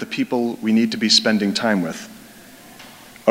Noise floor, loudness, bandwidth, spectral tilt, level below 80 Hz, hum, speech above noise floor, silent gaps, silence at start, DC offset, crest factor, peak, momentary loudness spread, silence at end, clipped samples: -43 dBFS; -18 LUFS; 16 kHz; -3.5 dB/octave; -64 dBFS; none; 24 dB; none; 0 s; under 0.1%; 20 dB; 0 dBFS; 13 LU; 0 s; under 0.1%